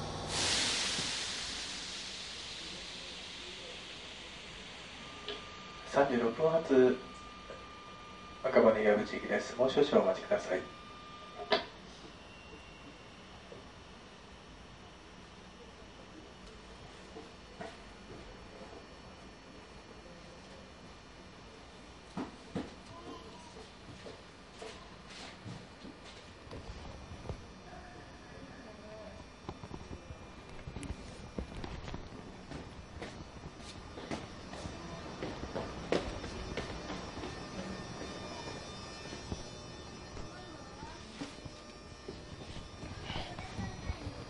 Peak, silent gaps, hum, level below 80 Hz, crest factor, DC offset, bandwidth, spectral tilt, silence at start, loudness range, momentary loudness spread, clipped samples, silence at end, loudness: -10 dBFS; none; none; -54 dBFS; 28 dB; under 0.1%; 11.5 kHz; -4 dB/octave; 0 s; 20 LU; 21 LU; under 0.1%; 0 s; -37 LUFS